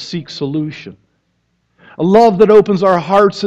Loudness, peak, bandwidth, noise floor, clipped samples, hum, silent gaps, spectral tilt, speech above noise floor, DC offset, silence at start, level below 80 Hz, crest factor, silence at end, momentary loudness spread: -11 LUFS; 0 dBFS; 7.8 kHz; -64 dBFS; under 0.1%; none; none; -7 dB/octave; 52 dB; under 0.1%; 0 s; -50 dBFS; 14 dB; 0 s; 15 LU